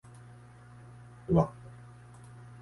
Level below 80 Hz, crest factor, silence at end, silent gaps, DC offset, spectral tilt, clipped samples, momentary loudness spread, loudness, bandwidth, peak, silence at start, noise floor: -54 dBFS; 24 dB; 0.95 s; none; under 0.1%; -9.5 dB/octave; under 0.1%; 25 LU; -29 LUFS; 11.5 kHz; -10 dBFS; 1.3 s; -52 dBFS